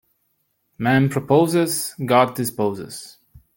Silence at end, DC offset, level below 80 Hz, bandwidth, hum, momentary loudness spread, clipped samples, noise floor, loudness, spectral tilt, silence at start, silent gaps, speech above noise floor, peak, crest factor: 0.45 s; under 0.1%; -58 dBFS; 17 kHz; none; 12 LU; under 0.1%; -70 dBFS; -19 LUFS; -5.5 dB/octave; 0.8 s; none; 50 dB; -2 dBFS; 18 dB